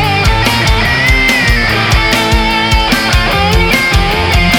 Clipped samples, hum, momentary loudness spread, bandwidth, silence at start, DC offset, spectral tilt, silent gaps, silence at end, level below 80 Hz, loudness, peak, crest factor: under 0.1%; none; 2 LU; 19.5 kHz; 0 s; under 0.1%; -4 dB/octave; none; 0 s; -16 dBFS; -9 LUFS; 0 dBFS; 10 dB